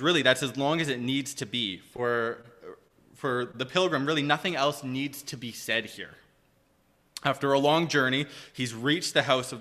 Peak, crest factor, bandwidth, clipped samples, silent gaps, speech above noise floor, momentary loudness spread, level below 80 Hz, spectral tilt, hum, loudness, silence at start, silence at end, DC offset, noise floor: -6 dBFS; 22 dB; 15 kHz; under 0.1%; none; 39 dB; 14 LU; -68 dBFS; -4 dB/octave; none; -27 LUFS; 0 s; 0 s; under 0.1%; -66 dBFS